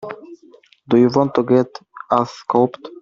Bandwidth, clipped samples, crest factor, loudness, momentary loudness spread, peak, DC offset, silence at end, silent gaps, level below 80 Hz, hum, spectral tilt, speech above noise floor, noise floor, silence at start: 7.2 kHz; under 0.1%; 16 dB; -17 LUFS; 17 LU; -2 dBFS; under 0.1%; 0 s; none; -58 dBFS; none; -7.5 dB/octave; 33 dB; -49 dBFS; 0 s